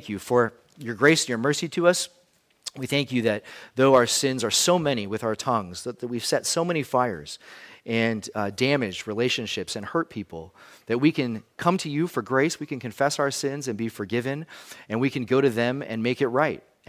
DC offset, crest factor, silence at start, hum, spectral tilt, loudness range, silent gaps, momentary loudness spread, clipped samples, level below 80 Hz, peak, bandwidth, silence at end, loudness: under 0.1%; 20 dB; 0 s; none; -4 dB/octave; 4 LU; none; 14 LU; under 0.1%; -62 dBFS; -6 dBFS; 16 kHz; 0.3 s; -25 LUFS